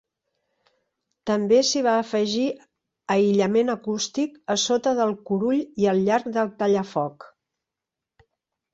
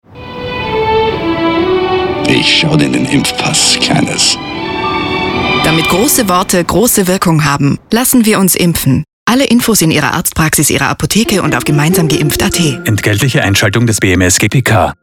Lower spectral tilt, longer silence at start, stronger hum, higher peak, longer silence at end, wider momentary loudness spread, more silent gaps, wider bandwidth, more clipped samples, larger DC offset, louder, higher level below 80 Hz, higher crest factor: about the same, -4.5 dB/octave vs -4 dB/octave; first, 1.25 s vs 0.1 s; neither; second, -8 dBFS vs 0 dBFS; first, 1.45 s vs 0.1 s; first, 8 LU vs 5 LU; second, none vs 9.13-9.26 s; second, 8 kHz vs 19 kHz; neither; neither; second, -23 LUFS vs -10 LUFS; second, -66 dBFS vs -34 dBFS; first, 16 dB vs 10 dB